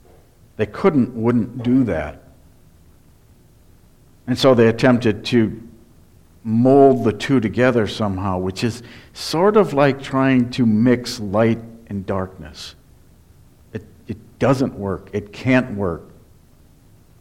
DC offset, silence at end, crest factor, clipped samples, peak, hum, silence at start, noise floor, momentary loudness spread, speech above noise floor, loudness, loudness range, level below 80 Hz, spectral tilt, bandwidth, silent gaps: under 0.1%; 1.2 s; 18 dB; under 0.1%; 0 dBFS; none; 0.6 s; -50 dBFS; 20 LU; 33 dB; -18 LUFS; 8 LU; -48 dBFS; -7 dB/octave; 13.5 kHz; none